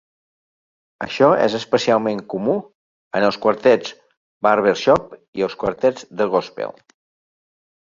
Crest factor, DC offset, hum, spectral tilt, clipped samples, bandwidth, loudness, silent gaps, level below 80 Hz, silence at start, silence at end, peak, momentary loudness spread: 18 dB; under 0.1%; none; -5.5 dB/octave; under 0.1%; 7.6 kHz; -19 LUFS; 2.75-3.11 s, 4.17-4.41 s, 5.28-5.33 s; -56 dBFS; 1 s; 1.1 s; -2 dBFS; 13 LU